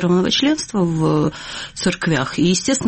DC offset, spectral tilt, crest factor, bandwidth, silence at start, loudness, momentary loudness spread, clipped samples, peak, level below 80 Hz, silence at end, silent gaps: under 0.1%; -4.5 dB/octave; 12 dB; 8.8 kHz; 0 s; -18 LUFS; 7 LU; under 0.1%; -6 dBFS; -46 dBFS; 0 s; none